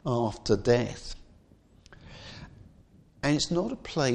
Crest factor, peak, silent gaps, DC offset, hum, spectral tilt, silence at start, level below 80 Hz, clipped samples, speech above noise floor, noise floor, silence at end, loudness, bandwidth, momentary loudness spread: 22 dB; -10 dBFS; none; under 0.1%; none; -5.5 dB/octave; 0.05 s; -50 dBFS; under 0.1%; 31 dB; -58 dBFS; 0 s; -28 LUFS; 10.5 kHz; 22 LU